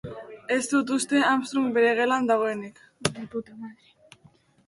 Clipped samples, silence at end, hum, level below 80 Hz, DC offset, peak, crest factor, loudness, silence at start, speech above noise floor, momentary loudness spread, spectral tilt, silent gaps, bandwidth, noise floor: under 0.1%; 0.95 s; none; -62 dBFS; under 0.1%; -4 dBFS; 22 dB; -25 LUFS; 0.05 s; 34 dB; 19 LU; -4 dB/octave; none; 11.5 kHz; -59 dBFS